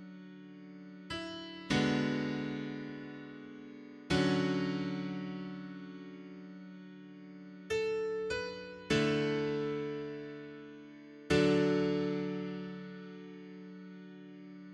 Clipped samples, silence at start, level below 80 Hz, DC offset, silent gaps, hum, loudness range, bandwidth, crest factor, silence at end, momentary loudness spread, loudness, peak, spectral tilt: under 0.1%; 0 s; -62 dBFS; under 0.1%; none; none; 6 LU; 11.5 kHz; 20 dB; 0 s; 20 LU; -35 LUFS; -16 dBFS; -6 dB/octave